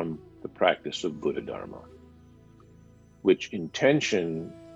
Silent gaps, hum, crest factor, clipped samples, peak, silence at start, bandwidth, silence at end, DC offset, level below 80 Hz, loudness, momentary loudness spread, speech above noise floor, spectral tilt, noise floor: none; none; 22 dB; under 0.1%; -6 dBFS; 0 s; 8.2 kHz; 0 s; under 0.1%; -62 dBFS; -27 LUFS; 16 LU; 27 dB; -5 dB/octave; -54 dBFS